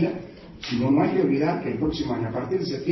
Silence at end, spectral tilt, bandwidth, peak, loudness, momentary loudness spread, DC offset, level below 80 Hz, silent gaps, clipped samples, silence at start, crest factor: 0 s; -7.5 dB/octave; 6.2 kHz; -8 dBFS; -24 LUFS; 12 LU; under 0.1%; -48 dBFS; none; under 0.1%; 0 s; 16 dB